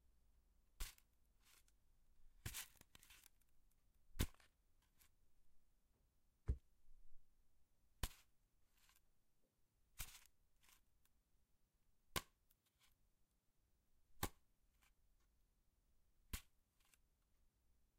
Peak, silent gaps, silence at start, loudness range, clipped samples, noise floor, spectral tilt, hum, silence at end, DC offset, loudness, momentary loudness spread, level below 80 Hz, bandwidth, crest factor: -24 dBFS; none; 0.75 s; 9 LU; under 0.1%; -82 dBFS; -3.5 dB/octave; none; 1.55 s; under 0.1%; -53 LUFS; 17 LU; -60 dBFS; 16 kHz; 32 dB